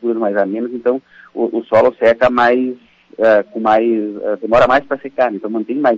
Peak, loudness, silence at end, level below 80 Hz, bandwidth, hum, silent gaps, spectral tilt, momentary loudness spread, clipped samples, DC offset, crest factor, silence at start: -2 dBFS; -15 LUFS; 0 s; -48 dBFS; 7.6 kHz; none; none; -6.5 dB/octave; 10 LU; under 0.1%; under 0.1%; 12 dB; 0 s